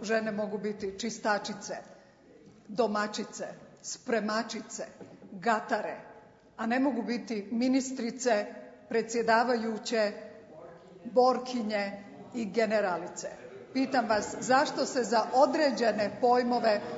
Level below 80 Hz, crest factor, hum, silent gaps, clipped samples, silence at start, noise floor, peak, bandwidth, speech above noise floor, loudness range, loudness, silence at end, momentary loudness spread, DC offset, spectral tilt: -72 dBFS; 20 dB; none; none; under 0.1%; 0 s; -57 dBFS; -10 dBFS; 8 kHz; 27 dB; 6 LU; -30 LUFS; 0 s; 17 LU; under 0.1%; -4 dB/octave